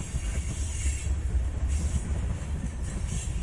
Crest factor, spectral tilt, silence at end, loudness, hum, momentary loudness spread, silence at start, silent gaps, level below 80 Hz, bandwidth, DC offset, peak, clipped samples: 14 dB; -5 dB/octave; 0 s; -32 LUFS; none; 4 LU; 0 s; none; -30 dBFS; 11.5 kHz; under 0.1%; -16 dBFS; under 0.1%